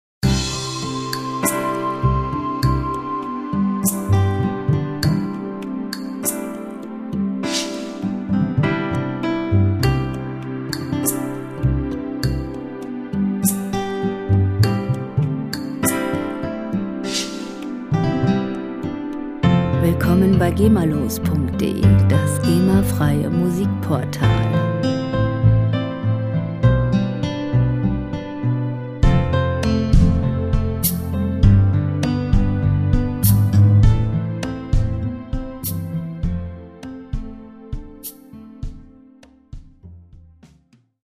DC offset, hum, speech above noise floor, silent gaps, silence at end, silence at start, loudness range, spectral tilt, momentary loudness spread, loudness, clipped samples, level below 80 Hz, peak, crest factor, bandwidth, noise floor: under 0.1%; none; 39 dB; none; 0.6 s; 0.25 s; 9 LU; -6.5 dB/octave; 12 LU; -20 LUFS; under 0.1%; -30 dBFS; -2 dBFS; 18 dB; 15.5 kHz; -56 dBFS